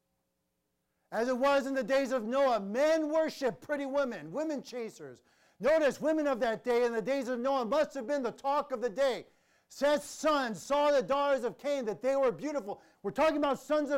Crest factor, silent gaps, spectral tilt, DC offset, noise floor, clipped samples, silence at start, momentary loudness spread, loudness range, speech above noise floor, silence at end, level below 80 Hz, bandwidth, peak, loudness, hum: 12 dB; none; -4.5 dB/octave; under 0.1%; -81 dBFS; under 0.1%; 1.1 s; 9 LU; 2 LU; 50 dB; 0 s; -66 dBFS; 16 kHz; -20 dBFS; -31 LUFS; none